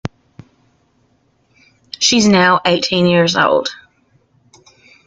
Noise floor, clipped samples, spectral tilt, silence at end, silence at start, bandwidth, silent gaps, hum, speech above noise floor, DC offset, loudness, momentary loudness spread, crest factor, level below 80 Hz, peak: -59 dBFS; under 0.1%; -4 dB/octave; 1.35 s; 0.05 s; 9.2 kHz; none; none; 46 dB; under 0.1%; -13 LUFS; 15 LU; 16 dB; -54 dBFS; 0 dBFS